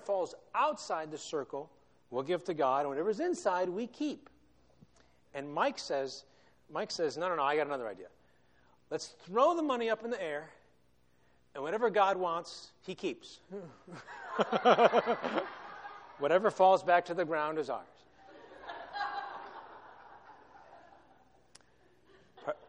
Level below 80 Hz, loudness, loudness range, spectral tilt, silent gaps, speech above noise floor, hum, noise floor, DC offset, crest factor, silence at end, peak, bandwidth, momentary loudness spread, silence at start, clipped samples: -76 dBFS; -33 LUFS; 13 LU; -4.5 dB/octave; none; 39 dB; none; -71 dBFS; under 0.1%; 24 dB; 0.1 s; -10 dBFS; 10 kHz; 21 LU; 0 s; under 0.1%